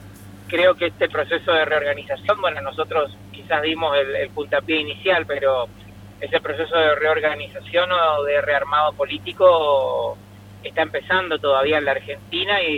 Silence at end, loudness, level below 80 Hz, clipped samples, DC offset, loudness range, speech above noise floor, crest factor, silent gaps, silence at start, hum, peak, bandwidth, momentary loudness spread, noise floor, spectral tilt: 0 s; -20 LUFS; -54 dBFS; under 0.1%; under 0.1%; 3 LU; 20 dB; 18 dB; none; 0 s; 50 Hz at -45 dBFS; -2 dBFS; 14.5 kHz; 9 LU; -40 dBFS; -5 dB/octave